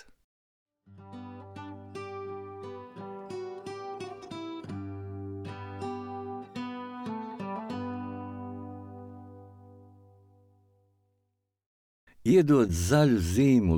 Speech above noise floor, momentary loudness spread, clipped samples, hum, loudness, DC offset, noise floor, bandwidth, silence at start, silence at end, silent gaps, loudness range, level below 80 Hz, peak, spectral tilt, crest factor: 57 dB; 21 LU; under 0.1%; none; -30 LUFS; under 0.1%; -79 dBFS; 19 kHz; 0.9 s; 0 s; 11.66-12.07 s; 17 LU; -52 dBFS; -12 dBFS; -6.5 dB/octave; 20 dB